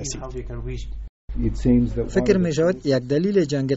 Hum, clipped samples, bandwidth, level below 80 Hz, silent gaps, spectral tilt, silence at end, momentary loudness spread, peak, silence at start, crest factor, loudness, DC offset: none; under 0.1%; 8 kHz; -32 dBFS; 1.09-1.28 s; -7 dB/octave; 0 s; 14 LU; -6 dBFS; 0 s; 16 dB; -21 LUFS; under 0.1%